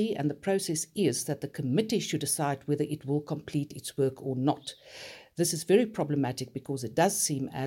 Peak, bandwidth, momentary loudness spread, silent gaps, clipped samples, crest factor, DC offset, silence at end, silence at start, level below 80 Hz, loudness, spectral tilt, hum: -12 dBFS; 17 kHz; 11 LU; none; under 0.1%; 18 dB; under 0.1%; 0 s; 0 s; -68 dBFS; -30 LUFS; -4.5 dB/octave; none